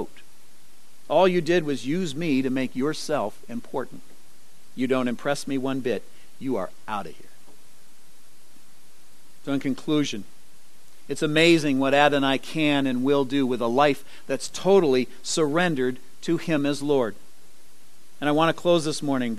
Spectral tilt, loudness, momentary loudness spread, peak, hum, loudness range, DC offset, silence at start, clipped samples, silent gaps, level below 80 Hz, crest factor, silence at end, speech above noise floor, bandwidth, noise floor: -5 dB/octave; -24 LUFS; 14 LU; -2 dBFS; none; 10 LU; 2%; 0 s; under 0.1%; none; -62 dBFS; 22 dB; 0 s; 33 dB; 13 kHz; -57 dBFS